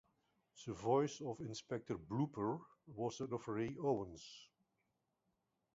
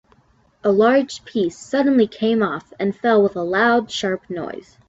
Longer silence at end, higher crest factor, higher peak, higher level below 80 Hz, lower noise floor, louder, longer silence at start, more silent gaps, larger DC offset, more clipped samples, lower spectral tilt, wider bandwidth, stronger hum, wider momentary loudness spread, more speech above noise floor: first, 1.3 s vs 0.3 s; first, 20 dB vs 14 dB; second, -24 dBFS vs -4 dBFS; second, -72 dBFS vs -60 dBFS; first, -86 dBFS vs -58 dBFS; second, -42 LUFS vs -19 LUFS; about the same, 0.55 s vs 0.65 s; neither; neither; neither; about the same, -6.5 dB/octave vs -5.5 dB/octave; about the same, 7.6 kHz vs 8 kHz; neither; first, 17 LU vs 9 LU; first, 44 dB vs 39 dB